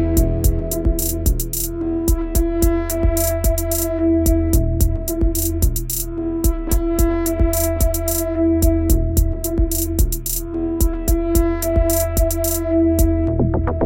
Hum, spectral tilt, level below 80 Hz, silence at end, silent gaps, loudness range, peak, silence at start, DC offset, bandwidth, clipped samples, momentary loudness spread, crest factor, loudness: none; -6 dB/octave; -20 dBFS; 0 s; none; 1 LU; -2 dBFS; 0 s; under 0.1%; 17.5 kHz; under 0.1%; 4 LU; 14 dB; -19 LUFS